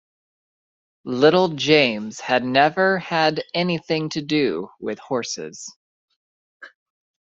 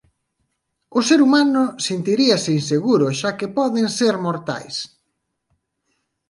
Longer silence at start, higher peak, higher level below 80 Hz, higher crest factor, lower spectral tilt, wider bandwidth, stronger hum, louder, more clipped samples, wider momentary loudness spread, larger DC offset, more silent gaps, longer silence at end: first, 1.05 s vs 0.9 s; about the same, -2 dBFS vs -2 dBFS; about the same, -64 dBFS vs -66 dBFS; about the same, 20 dB vs 18 dB; about the same, -4.5 dB/octave vs -4.5 dB/octave; second, 7.8 kHz vs 11.5 kHz; neither; about the same, -20 LUFS vs -18 LUFS; neither; about the same, 14 LU vs 12 LU; neither; first, 5.76-6.08 s, 6.16-6.60 s vs none; second, 0.55 s vs 1.45 s